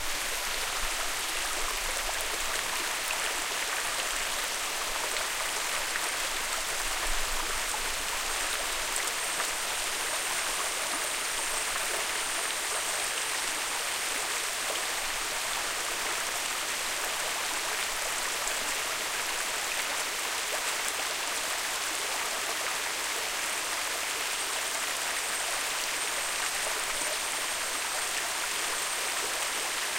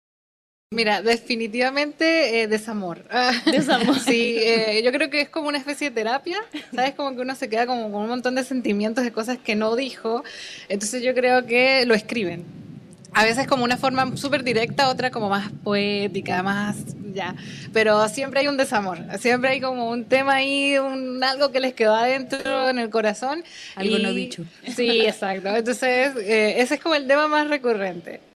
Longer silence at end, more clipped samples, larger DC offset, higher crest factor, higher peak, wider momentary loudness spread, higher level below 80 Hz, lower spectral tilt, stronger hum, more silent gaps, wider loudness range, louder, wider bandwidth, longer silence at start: second, 0 s vs 0.15 s; neither; neither; about the same, 20 dB vs 16 dB; second, -12 dBFS vs -6 dBFS; second, 1 LU vs 10 LU; first, -48 dBFS vs -64 dBFS; second, 1 dB/octave vs -4 dB/octave; neither; neither; second, 1 LU vs 4 LU; second, -29 LUFS vs -22 LUFS; first, 16.5 kHz vs 14.5 kHz; second, 0 s vs 0.7 s